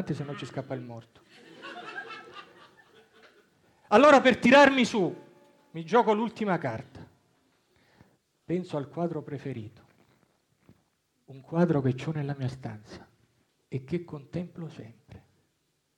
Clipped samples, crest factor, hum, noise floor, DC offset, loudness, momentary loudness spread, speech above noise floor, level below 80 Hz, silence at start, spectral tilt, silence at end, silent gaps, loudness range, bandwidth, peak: under 0.1%; 24 dB; none; -75 dBFS; under 0.1%; -26 LUFS; 26 LU; 49 dB; -66 dBFS; 0 s; -6 dB/octave; 0.8 s; none; 17 LU; 11 kHz; -6 dBFS